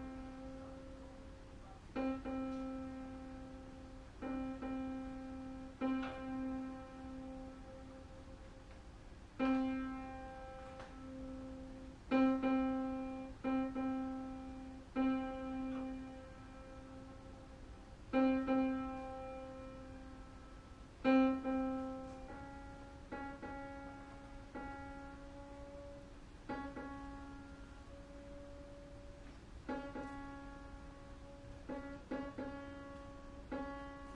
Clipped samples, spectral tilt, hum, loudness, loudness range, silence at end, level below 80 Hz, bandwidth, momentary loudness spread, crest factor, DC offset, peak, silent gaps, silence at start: under 0.1%; -7 dB/octave; none; -42 LUFS; 12 LU; 0 s; -58 dBFS; 9.4 kHz; 19 LU; 22 dB; under 0.1%; -22 dBFS; none; 0 s